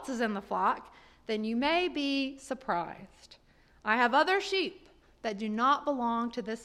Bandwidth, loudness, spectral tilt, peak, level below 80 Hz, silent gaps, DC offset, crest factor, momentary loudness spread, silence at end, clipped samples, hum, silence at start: 13 kHz; -30 LUFS; -4 dB/octave; -12 dBFS; -64 dBFS; none; under 0.1%; 20 dB; 13 LU; 0 s; under 0.1%; none; 0 s